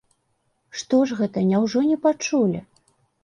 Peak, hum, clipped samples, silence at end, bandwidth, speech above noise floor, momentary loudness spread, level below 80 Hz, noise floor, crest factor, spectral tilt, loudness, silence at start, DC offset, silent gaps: -8 dBFS; none; under 0.1%; 0.6 s; 10 kHz; 50 dB; 12 LU; -64 dBFS; -70 dBFS; 14 dB; -6 dB/octave; -21 LUFS; 0.75 s; under 0.1%; none